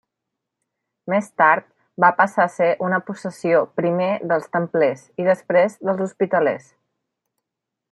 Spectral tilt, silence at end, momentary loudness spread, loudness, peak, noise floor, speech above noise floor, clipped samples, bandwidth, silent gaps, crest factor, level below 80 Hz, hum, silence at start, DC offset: -7 dB/octave; 1.35 s; 7 LU; -20 LUFS; -2 dBFS; -83 dBFS; 64 dB; under 0.1%; 12 kHz; none; 20 dB; -72 dBFS; none; 1.05 s; under 0.1%